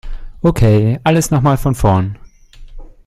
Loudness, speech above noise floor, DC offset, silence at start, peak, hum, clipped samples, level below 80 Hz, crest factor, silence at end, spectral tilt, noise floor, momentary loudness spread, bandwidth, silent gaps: -14 LUFS; 24 dB; under 0.1%; 0.05 s; 0 dBFS; none; under 0.1%; -26 dBFS; 14 dB; 0.2 s; -7 dB/octave; -36 dBFS; 6 LU; 15 kHz; none